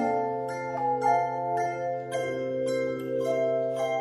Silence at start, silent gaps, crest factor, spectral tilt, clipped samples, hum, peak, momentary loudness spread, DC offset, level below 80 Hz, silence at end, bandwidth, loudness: 0 s; none; 16 dB; -6 dB/octave; under 0.1%; none; -12 dBFS; 6 LU; under 0.1%; -70 dBFS; 0 s; 13.5 kHz; -28 LUFS